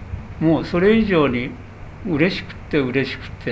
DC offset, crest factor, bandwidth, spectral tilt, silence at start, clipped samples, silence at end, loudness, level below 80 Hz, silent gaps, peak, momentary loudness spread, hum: under 0.1%; 18 dB; 8 kHz; -8 dB/octave; 0 s; under 0.1%; 0 s; -19 LUFS; -38 dBFS; none; -2 dBFS; 17 LU; none